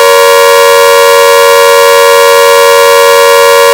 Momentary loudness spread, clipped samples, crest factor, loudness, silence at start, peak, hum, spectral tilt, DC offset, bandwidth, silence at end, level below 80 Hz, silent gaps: 0 LU; 20%; 2 dB; -2 LUFS; 0 s; 0 dBFS; none; 1 dB/octave; under 0.1%; over 20 kHz; 0 s; -46 dBFS; none